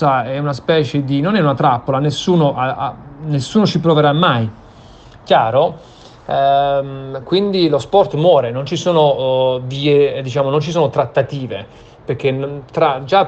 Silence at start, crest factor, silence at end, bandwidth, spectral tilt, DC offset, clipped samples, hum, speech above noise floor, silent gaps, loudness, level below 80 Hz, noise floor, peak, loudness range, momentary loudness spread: 0 s; 16 dB; 0 s; 8.6 kHz; -6.5 dB/octave; under 0.1%; under 0.1%; none; 25 dB; none; -15 LUFS; -48 dBFS; -40 dBFS; 0 dBFS; 3 LU; 10 LU